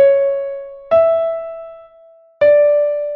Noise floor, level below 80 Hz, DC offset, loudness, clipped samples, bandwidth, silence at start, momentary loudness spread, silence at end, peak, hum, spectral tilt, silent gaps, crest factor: -47 dBFS; -56 dBFS; under 0.1%; -14 LUFS; under 0.1%; 4.5 kHz; 0 s; 18 LU; 0 s; -4 dBFS; none; -7 dB/octave; none; 12 dB